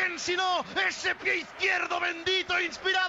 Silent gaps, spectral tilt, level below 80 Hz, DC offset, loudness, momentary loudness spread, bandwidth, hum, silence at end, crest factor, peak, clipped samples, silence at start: none; -1.5 dB/octave; -66 dBFS; under 0.1%; -27 LUFS; 3 LU; 8 kHz; none; 0 s; 14 dB; -14 dBFS; under 0.1%; 0 s